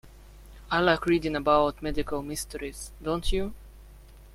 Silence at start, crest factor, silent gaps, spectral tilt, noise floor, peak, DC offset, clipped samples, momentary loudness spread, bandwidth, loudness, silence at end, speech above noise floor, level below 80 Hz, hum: 0.05 s; 20 dB; none; -4.5 dB/octave; -49 dBFS; -8 dBFS; under 0.1%; under 0.1%; 13 LU; 16 kHz; -28 LUFS; 0.05 s; 22 dB; -40 dBFS; 50 Hz at -45 dBFS